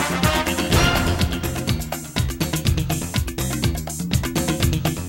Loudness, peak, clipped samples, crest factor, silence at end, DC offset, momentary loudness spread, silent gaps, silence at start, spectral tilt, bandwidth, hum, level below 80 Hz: -22 LUFS; -4 dBFS; under 0.1%; 16 dB; 0 s; under 0.1%; 7 LU; none; 0 s; -4.5 dB/octave; 16.5 kHz; none; -30 dBFS